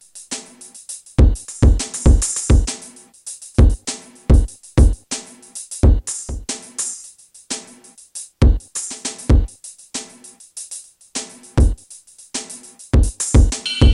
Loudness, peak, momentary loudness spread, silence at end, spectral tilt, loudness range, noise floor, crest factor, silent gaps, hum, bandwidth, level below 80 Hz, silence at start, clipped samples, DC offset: -19 LUFS; -2 dBFS; 18 LU; 0 s; -5 dB/octave; 6 LU; -45 dBFS; 16 dB; none; none; 12 kHz; -20 dBFS; 0.15 s; under 0.1%; under 0.1%